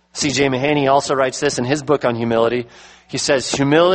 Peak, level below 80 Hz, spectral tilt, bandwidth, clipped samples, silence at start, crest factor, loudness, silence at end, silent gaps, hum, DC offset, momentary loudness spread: -2 dBFS; -50 dBFS; -4 dB/octave; 8.8 kHz; under 0.1%; 0.15 s; 16 dB; -17 LUFS; 0 s; none; none; under 0.1%; 6 LU